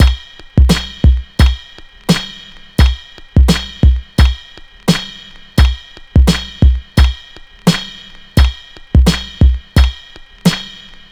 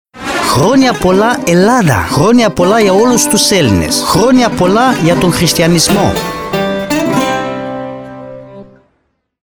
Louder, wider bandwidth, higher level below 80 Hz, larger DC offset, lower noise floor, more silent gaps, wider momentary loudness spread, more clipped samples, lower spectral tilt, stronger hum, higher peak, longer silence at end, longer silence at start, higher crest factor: second, -14 LUFS vs -10 LUFS; second, 13.5 kHz vs over 20 kHz; first, -14 dBFS vs -34 dBFS; neither; second, -36 dBFS vs -62 dBFS; neither; first, 16 LU vs 12 LU; neither; about the same, -5.5 dB/octave vs -4.5 dB/octave; neither; about the same, 0 dBFS vs 0 dBFS; second, 0.4 s vs 0.8 s; second, 0 s vs 0.15 s; about the same, 12 dB vs 10 dB